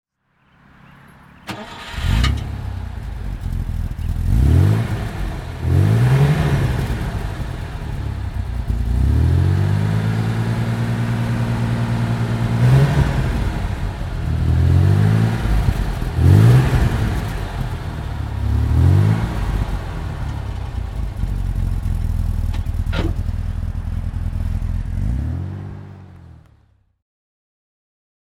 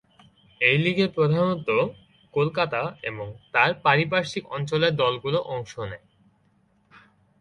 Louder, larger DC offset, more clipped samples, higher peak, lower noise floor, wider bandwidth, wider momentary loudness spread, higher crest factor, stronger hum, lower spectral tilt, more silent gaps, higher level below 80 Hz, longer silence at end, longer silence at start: first, -20 LUFS vs -24 LUFS; neither; neither; first, 0 dBFS vs -4 dBFS; second, -60 dBFS vs -64 dBFS; first, 15 kHz vs 10.5 kHz; about the same, 13 LU vs 13 LU; about the same, 18 dB vs 22 dB; neither; first, -7.5 dB/octave vs -6 dB/octave; neither; first, -24 dBFS vs -60 dBFS; first, 1.95 s vs 1.45 s; first, 1.45 s vs 0.6 s